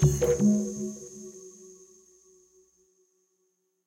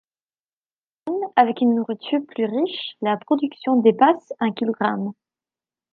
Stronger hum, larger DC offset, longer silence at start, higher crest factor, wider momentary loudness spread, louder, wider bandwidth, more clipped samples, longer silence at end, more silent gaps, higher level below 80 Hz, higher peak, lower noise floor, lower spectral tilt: neither; neither; second, 0 s vs 1.05 s; about the same, 18 dB vs 20 dB; first, 25 LU vs 9 LU; second, -26 LUFS vs -21 LUFS; first, 16 kHz vs 4.8 kHz; neither; first, 2.15 s vs 0.8 s; neither; first, -46 dBFS vs -76 dBFS; second, -12 dBFS vs -2 dBFS; second, -75 dBFS vs under -90 dBFS; about the same, -7 dB/octave vs -8 dB/octave